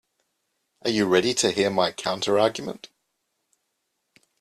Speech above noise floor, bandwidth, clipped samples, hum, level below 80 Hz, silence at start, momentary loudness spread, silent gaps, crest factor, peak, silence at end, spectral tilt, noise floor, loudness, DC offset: 54 dB; 13.5 kHz; under 0.1%; none; -66 dBFS; 0.85 s; 13 LU; none; 20 dB; -6 dBFS; 1.55 s; -3.5 dB/octave; -77 dBFS; -23 LUFS; under 0.1%